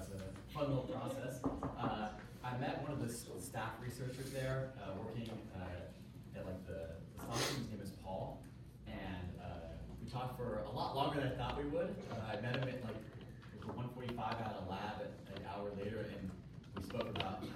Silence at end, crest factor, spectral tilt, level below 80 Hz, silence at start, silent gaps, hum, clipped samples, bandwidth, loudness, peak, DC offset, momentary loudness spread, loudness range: 0 s; 22 dB; -5.5 dB/octave; -60 dBFS; 0 s; none; none; under 0.1%; 16.5 kHz; -44 LUFS; -22 dBFS; under 0.1%; 10 LU; 4 LU